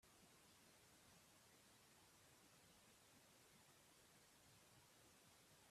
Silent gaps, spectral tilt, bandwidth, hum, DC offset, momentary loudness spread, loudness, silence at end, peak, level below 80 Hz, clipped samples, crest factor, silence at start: none; -2.5 dB/octave; 14.5 kHz; none; under 0.1%; 0 LU; -70 LUFS; 0 s; -58 dBFS; under -90 dBFS; under 0.1%; 14 dB; 0 s